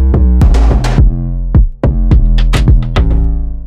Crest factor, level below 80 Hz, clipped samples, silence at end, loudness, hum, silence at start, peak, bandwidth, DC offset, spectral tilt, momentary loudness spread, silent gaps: 8 dB; -8 dBFS; under 0.1%; 0 s; -11 LUFS; none; 0 s; 0 dBFS; 9.4 kHz; under 0.1%; -7.5 dB/octave; 5 LU; none